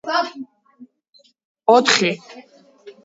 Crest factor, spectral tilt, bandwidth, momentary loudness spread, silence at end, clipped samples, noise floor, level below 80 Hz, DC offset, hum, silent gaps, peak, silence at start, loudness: 22 dB; -2.5 dB/octave; 7.8 kHz; 23 LU; 0.15 s; under 0.1%; -57 dBFS; -72 dBFS; under 0.1%; none; 1.09-1.13 s, 1.45-1.55 s; 0 dBFS; 0.05 s; -17 LUFS